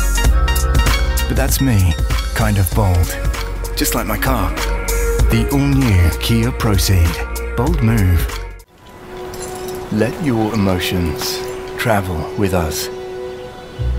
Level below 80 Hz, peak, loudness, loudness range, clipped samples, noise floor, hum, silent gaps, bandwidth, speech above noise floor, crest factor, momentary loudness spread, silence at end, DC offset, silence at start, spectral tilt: -20 dBFS; 0 dBFS; -17 LUFS; 4 LU; under 0.1%; -38 dBFS; none; none; 16.5 kHz; 23 dB; 16 dB; 12 LU; 0 s; under 0.1%; 0 s; -5 dB/octave